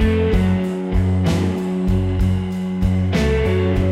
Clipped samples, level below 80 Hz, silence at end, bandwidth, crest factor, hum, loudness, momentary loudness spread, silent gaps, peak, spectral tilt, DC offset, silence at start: under 0.1%; -26 dBFS; 0 s; 12 kHz; 12 dB; none; -19 LUFS; 4 LU; none; -6 dBFS; -7.5 dB/octave; under 0.1%; 0 s